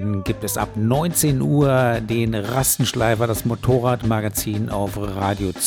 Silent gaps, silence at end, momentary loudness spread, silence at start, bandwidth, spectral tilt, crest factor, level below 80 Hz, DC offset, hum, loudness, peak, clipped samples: none; 0 s; 6 LU; 0 s; 19 kHz; -5 dB/octave; 16 dB; -40 dBFS; under 0.1%; none; -20 LUFS; -4 dBFS; under 0.1%